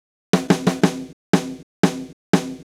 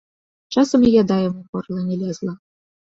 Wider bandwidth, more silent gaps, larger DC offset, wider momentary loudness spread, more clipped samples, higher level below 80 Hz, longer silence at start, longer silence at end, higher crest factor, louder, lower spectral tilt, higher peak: first, 15.5 kHz vs 7.8 kHz; first, 1.13-1.33 s, 1.63-1.83 s, 2.13-2.33 s vs 1.49-1.53 s; neither; about the same, 14 LU vs 15 LU; neither; about the same, -56 dBFS vs -52 dBFS; second, 0.35 s vs 0.5 s; second, 0 s vs 0.55 s; about the same, 20 dB vs 16 dB; about the same, -21 LUFS vs -19 LUFS; second, -5.5 dB/octave vs -7 dB/octave; about the same, -2 dBFS vs -4 dBFS